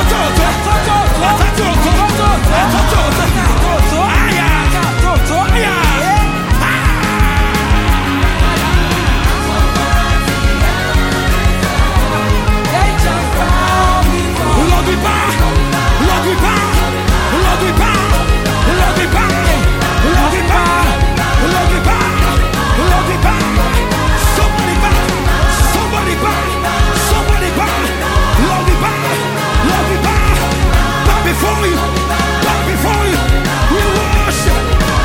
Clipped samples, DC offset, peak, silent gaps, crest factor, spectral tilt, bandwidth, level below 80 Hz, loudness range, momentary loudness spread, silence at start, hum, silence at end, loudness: under 0.1%; under 0.1%; 0 dBFS; none; 12 dB; -4.5 dB/octave; 17 kHz; -16 dBFS; 1 LU; 2 LU; 0 s; none; 0 s; -12 LUFS